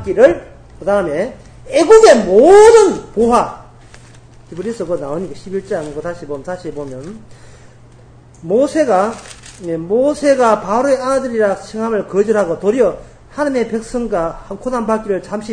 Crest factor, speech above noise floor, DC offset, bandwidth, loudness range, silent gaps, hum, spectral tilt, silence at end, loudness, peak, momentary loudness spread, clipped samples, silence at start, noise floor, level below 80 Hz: 14 dB; 28 dB; under 0.1%; 9.8 kHz; 14 LU; none; none; -5 dB/octave; 0 s; -13 LUFS; 0 dBFS; 19 LU; 0.3%; 0 s; -41 dBFS; -42 dBFS